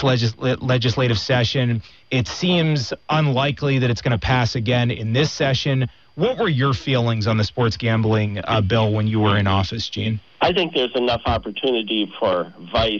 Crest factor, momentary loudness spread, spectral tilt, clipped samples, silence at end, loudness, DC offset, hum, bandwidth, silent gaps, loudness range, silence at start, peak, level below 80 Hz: 14 dB; 5 LU; -6 dB/octave; under 0.1%; 0 s; -20 LUFS; 0.2%; none; 7.2 kHz; none; 1 LU; 0 s; -6 dBFS; -44 dBFS